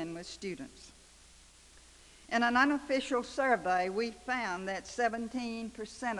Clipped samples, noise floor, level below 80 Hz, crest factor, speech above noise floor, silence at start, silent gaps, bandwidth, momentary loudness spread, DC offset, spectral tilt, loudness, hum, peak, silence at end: under 0.1%; -58 dBFS; -62 dBFS; 20 dB; 25 dB; 0 s; none; 12 kHz; 13 LU; under 0.1%; -4 dB/octave; -33 LUFS; none; -14 dBFS; 0 s